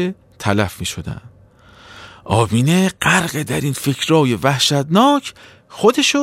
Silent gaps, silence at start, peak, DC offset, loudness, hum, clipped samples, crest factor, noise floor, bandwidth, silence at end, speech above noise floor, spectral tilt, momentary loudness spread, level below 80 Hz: none; 0 s; -2 dBFS; under 0.1%; -16 LUFS; none; under 0.1%; 16 dB; -46 dBFS; 16.5 kHz; 0 s; 30 dB; -4.5 dB/octave; 12 LU; -46 dBFS